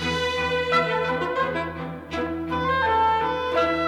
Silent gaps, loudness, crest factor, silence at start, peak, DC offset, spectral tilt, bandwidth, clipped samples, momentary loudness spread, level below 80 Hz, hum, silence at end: none; -23 LUFS; 14 dB; 0 s; -10 dBFS; under 0.1%; -5 dB/octave; 13.5 kHz; under 0.1%; 9 LU; -46 dBFS; none; 0 s